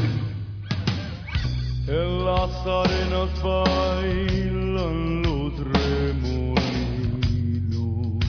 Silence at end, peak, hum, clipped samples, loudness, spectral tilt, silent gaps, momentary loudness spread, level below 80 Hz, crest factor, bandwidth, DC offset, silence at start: 0 s; -6 dBFS; none; under 0.1%; -25 LUFS; -7 dB/octave; none; 5 LU; -30 dBFS; 18 dB; 5.4 kHz; under 0.1%; 0 s